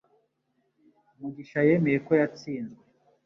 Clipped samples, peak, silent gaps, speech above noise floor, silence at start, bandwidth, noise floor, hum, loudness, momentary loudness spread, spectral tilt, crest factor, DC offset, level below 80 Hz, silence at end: under 0.1%; -10 dBFS; none; 49 dB; 1.2 s; 7 kHz; -74 dBFS; none; -26 LUFS; 18 LU; -8.5 dB/octave; 20 dB; under 0.1%; -70 dBFS; 0.5 s